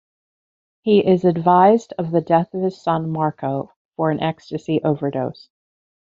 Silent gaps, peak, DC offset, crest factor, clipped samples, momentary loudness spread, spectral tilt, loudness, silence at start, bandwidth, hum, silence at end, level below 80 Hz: 3.76-3.91 s; -2 dBFS; under 0.1%; 18 dB; under 0.1%; 13 LU; -8 dB/octave; -19 LUFS; 0.85 s; 7.6 kHz; none; 0.8 s; -60 dBFS